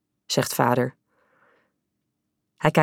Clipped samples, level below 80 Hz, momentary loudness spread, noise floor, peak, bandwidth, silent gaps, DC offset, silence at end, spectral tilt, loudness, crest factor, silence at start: under 0.1%; -62 dBFS; 5 LU; -78 dBFS; -4 dBFS; 19 kHz; none; under 0.1%; 0 s; -5 dB/octave; -24 LUFS; 22 dB; 0.3 s